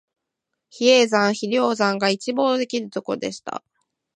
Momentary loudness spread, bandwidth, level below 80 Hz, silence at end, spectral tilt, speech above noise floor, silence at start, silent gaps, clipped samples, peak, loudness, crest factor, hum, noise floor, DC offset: 13 LU; 10.5 kHz; -74 dBFS; 0.6 s; -3.5 dB/octave; 60 dB; 0.75 s; none; under 0.1%; -4 dBFS; -20 LUFS; 18 dB; none; -81 dBFS; under 0.1%